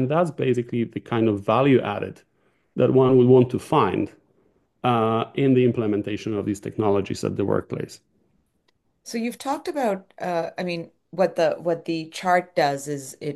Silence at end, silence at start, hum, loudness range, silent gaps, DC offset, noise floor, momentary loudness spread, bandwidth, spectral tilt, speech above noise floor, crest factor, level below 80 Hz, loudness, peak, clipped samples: 0 s; 0 s; none; 8 LU; none; under 0.1%; -69 dBFS; 12 LU; 12.5 kHz; -7 dB/octave; 47 dB; 18 dB; -64 dBFS; -23 LUFS; -4 dBFS; under 0.1%